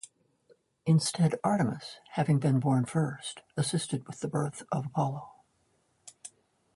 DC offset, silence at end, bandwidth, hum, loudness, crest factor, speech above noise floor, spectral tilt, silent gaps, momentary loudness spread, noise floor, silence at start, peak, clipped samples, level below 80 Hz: under 0.1%; 0.5 s; 11.5 kHz; none; -30 LUFS; 18 dB; 43 dB; -6 dB/octave; none; 16 LU; -72 dBFS; 0.85 s; -14 dBFS; under 0.1%; -68 dBFS